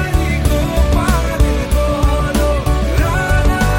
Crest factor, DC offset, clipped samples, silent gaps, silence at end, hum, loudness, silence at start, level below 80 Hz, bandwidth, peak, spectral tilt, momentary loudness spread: 12 dB; under 0.1%; under 0.1%; none; 0 s; none; -15 LUFS; 0 s; -16 dBFS; 17 kHz; 0 dBFS; -6 dB/octave; 2 LU